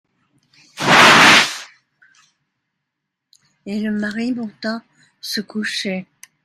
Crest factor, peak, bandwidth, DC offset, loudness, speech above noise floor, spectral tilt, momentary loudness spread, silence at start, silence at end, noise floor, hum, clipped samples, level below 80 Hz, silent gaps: 18 dB; 0 dBFS; 16 kHz; under 0.1%; -14 LUFS; 56 dB; -2.5 dB/octave; 21 LU; 0.75 s; 0.4 s; -79 dBFS; none; under 0.1%; -58 dBFS; none